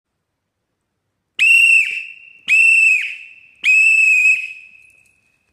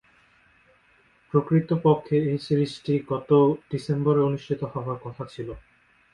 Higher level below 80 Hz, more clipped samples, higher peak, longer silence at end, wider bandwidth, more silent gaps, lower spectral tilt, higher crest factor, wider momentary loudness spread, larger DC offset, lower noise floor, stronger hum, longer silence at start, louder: second, -76 dBFS vs -58 dBFS; neither; about the same, -4 dBFS vs -6 dBFS; first, 0.95 s vs 0.55 s; first, 14.5 kHz vs 10.5 kHz; neither; second, 4.5 dB/octave vs -9 dB/octave; second, 12 dB vs 18 dB; first, 20 LU vs 15 LU; neither; first, -74 dBFS vs -61 dBFS; neither; about the same, 1.4 s vs 1.35 s; first, -10 LUFS vs -24 LUFS